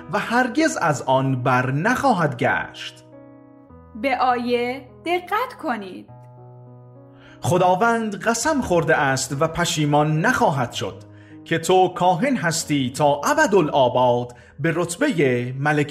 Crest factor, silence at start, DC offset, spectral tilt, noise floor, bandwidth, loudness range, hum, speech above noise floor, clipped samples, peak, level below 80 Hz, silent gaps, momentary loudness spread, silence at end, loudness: 16 dB; 0 s; under 0.1%; -5 dB/octave; -46 dBFS; 15.5 kHz; 6 LU; none; 26 dB; under 0.1%; -4 dBFS; -52 dBFS; none; 10 LU; 0 s; -20 LUFS